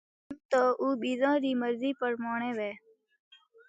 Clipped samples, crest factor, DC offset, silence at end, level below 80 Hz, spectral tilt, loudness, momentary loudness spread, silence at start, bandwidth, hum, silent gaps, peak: under 0.1%; 16 dB; under 0.1%; 0.9 s; -80 dBFS; -5 dB/octave; -30 LUFS; 14 LU; 0.3 s; 9.2 kHz; none; 0.45-0.49 s; -14 dBFS